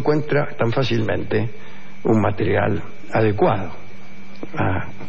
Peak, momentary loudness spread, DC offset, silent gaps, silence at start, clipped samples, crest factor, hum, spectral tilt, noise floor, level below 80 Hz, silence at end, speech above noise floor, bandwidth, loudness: -4 dBFS; 22 LU; 7%; none; 0 s; under 0.1%; 16 dB; none; -8 dB/octave; -42 dBFS; -52 dBFS; 0 s; 21 dB; 7.4 kHz; -21 LUFS